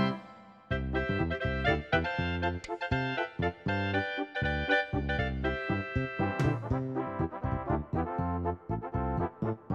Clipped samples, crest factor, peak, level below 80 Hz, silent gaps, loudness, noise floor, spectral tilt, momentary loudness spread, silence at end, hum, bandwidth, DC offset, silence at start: under 0.1%; 18 dB; -14 dBFS; -44 dBFS; none; -32 LUFS; -52 dBFS; -7.5 dB/octave; 6 LU; 0 s; none; 8.6 kHz; under 0.1%; 0 s